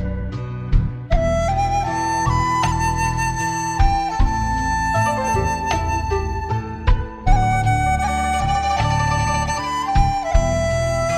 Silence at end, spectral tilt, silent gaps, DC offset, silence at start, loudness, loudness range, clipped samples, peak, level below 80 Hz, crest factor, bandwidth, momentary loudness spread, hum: 0 s; -5 dB/octave; none; under 0.1%; 0 s; -20 LUFS; 1 LU; under 0.1%; -2 dBFS; -24 dBFS; 16 dB; 15 kHz; 4 LU; none